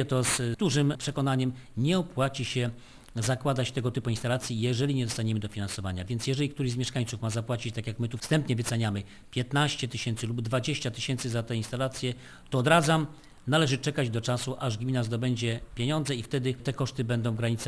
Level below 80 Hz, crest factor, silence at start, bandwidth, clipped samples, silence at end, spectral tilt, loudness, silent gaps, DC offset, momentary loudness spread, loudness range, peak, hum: -54 dBFS; 22 dB; 0 s; 11 kHz; under 0.1%; 0 s; -5 dB/octave; -29 LUFS; none; under 0.1%; 7 LU; 3 LU; -8 dBFS; none